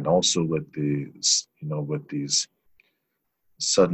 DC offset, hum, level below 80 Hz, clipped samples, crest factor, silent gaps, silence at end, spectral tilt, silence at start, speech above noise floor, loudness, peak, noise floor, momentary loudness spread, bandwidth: under 0.1%; none; -60 dBFS; under 0.1%; 20 dB; none; 0 s; -3.5 dB/octave; 0 s; 53 dB; -24 LUFS; -6 dBFS; -77 dBFS; 10 LU; 10 kHz